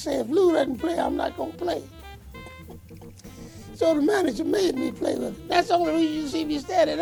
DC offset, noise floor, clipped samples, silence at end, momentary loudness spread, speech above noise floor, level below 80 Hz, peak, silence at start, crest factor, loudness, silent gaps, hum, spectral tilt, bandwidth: under 0.1%; -44 dBFS; under 0.1%; 0 s; 22 LU; 20 dB; -50 dBFS; -6 dBFS; 0 s; 20 dB; -24 LUFS; none; none; -5 dB/octave; 20 kHz